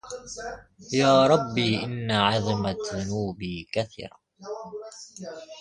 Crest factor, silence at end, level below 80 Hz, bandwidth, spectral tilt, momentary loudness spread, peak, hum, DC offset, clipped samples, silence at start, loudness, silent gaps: 20 dB; 0 s; -54 dBFS; 11 kHz; -5 dB/octave; 20 LU; -6 dBFS; none; under 0.1%; under 0.1%; 0.05 s; -25 LUFS; none